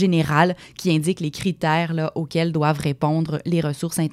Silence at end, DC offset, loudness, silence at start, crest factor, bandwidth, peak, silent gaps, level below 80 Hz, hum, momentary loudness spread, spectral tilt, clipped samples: 0 s; under 0.1%; -22 LUFS; 0 s; 16 dB; 15 kHz; -4 dBFS; none; -54 dBFS; none; 6 LU; -6 dB/octave; under 0.1%